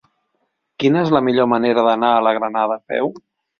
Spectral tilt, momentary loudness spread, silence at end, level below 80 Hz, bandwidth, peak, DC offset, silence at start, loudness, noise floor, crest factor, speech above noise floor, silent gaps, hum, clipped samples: -7.5 dB/octave; 7 LU; 0.4 s; -60 dBFS; 6.8 kHz; -2 dBFS; under 0.1%; 0.8 s; -17 LUFS; -70 dBFS; 16 dB; 54 dB; none; none; under 0.1%